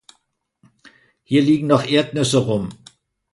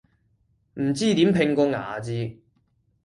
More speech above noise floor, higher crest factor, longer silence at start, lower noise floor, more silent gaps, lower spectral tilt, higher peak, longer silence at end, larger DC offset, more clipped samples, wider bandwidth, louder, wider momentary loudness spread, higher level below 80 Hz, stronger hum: first, 51 dB vs 45 dB; about the same, 20 dB vs 18 dB; first, 1.3 s vs 0.75 s; about the same, -68 dBFS vs -67 dBFS; neither; about the same, -5.5 dB/octave vs -6 dB/octave; first, -2 dBFS vs -6 dBFS; about the same, 0.6 s vs 0.7 s; neither; neither; about the same, 11.5 kHz vs 11.5 kHz; first, -18 LUFS vs -23 LUFS; second, 8 LU vs 12 LU; about the same, -56 dBFS vs -58 dBFS; neither